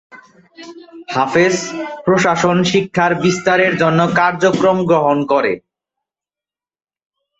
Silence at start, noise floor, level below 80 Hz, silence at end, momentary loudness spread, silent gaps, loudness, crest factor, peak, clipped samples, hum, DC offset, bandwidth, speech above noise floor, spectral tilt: 0.15 s; under -90 dBFS; -54 dBFS; 1.8 s; 8 LU; none; -14 LUFS; 14 dB; -2 dBFS; under 0.1%; none; under 0.1%; 8.2 kHz; over 75 dB; -5 dB/octave